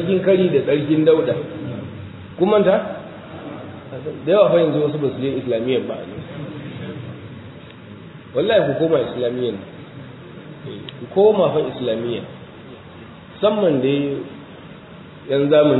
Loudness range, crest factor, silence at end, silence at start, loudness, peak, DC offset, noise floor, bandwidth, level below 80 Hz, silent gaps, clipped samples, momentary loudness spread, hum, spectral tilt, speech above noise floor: 5 LU; 18 dB; 0 s; 0 s; -19 LUFS; -2 dBFS; under 0.1%; -39 dBFS; 4.1 kHz; -58 dBFS; none; under 0.1%; 23 LU; none; -10.5 dB/octave; 22 dB